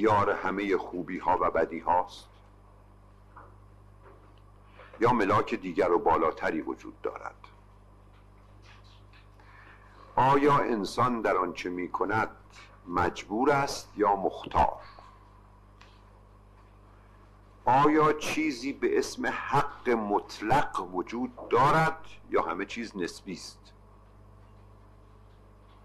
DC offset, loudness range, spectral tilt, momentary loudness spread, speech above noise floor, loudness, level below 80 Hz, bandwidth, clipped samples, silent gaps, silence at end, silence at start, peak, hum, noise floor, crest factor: under 0.1%; 9 LU; -5.5 dB/octave; 13 LU; 27 dB; -28 LUFS; -54 dBFS; 13 kHz; under 0.1%; none; 2.3 s; 0 s; -12 dBFS; 50 Hz at -55 dBFS; -55 dBFS; 18 dB